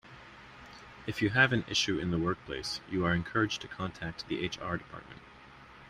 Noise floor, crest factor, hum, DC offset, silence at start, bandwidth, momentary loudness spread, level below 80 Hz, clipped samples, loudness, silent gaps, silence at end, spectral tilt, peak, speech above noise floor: -53 dBFS; 24 dB; none; under 0.1%; 0.05 s; 14 kHz; 25 LU; -56 dBFS; under 0.1%; -32 LUFS; none; 0 s; -4.5 dB/octave; -10 dBFS; 21 dB